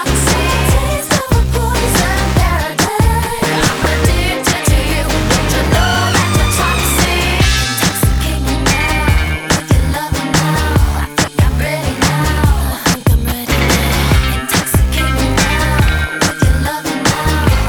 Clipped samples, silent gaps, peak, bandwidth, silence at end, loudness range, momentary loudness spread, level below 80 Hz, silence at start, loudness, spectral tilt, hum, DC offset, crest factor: under 0.1%; none; 0 dBFS; over 20 kHz; 0 s; 2 LU; 3 LU; -18 dBFS; 0 s; -13 LUFS; -4 dB/octave; none; under 0.1%; 12 dB